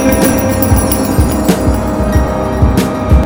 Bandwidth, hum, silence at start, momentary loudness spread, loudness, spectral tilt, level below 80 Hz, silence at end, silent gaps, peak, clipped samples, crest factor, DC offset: 17.5 kHz; none; 0 s; 3 LU; -12 LUFS; -6 dB/octave; -16 dBFS; 0 s; none; 0 dBFS; 0.1%; 10 dB; under 0.1%